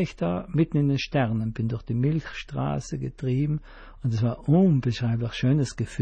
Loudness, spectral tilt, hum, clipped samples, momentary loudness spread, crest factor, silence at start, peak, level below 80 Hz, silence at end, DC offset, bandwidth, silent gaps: -26 LUFS; -7.5 dB/octave; none; under 0.1%; 9 LU; 16 dB; 0 s; -10 dBFS; -46 dBFS; 0 s; under 0.1%; 9.2 kHz; none